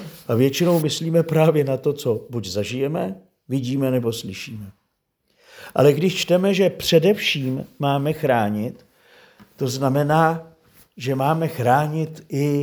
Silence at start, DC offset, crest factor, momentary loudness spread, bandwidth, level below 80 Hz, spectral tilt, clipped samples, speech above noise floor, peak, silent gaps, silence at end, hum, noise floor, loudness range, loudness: 0 s; under 0.1%; 18 dB; 11 LU; over 20 kHz; -60 dBFS; -6 dB/octave; under 0.1%; 52 dB; -2 dBFS; none; 0 s; none; -72 dBFS; 6 LU; -21 LUFS